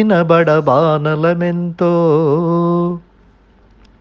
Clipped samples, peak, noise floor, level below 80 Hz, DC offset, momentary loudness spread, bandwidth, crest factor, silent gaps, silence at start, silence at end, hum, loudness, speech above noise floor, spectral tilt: under 0.1%; 0 dBFS; -48 dBFS; -52 dBFS; under 0.1%; 7 LU; 6.2 kHz; 14 dB; none; 0 s; 1 s; none; -14 LUFS; 35 dB; -9.5 dB/octave